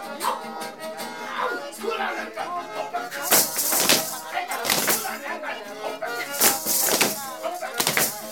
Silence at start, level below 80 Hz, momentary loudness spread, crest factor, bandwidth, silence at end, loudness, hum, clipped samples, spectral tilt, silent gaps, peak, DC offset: 0 s; -66 dBFS; 14 LU; 24 dB; over 20 kHz; 0 s; -23 LUFS; none; under 0.1%; -0.5 dB/octave; none; -2 dBFS; 0.2%